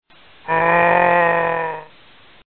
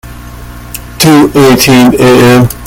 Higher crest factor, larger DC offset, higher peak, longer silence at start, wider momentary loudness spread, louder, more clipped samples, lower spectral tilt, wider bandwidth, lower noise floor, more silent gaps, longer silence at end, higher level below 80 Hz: first, 16 dB vs 6 dB; first, 0.3% vs under 0.1%; about the same, -2 dBFS vs 0 dBFS; first, 0.45 s vs 0.05 s; second, 16 LU vs 19 LU; second, -16 LUFS vs -4 LUFS; second, under 0.1% vs 4%; first, -9 dB/octave vs -5 dB/octave; second, 4.4 kHz vs over 20 kHz; first, -49 dBFS vs -24 dBFS; neither; first, 0.7 s vs 0 s; second, -54 dBFS vs -28 dBFS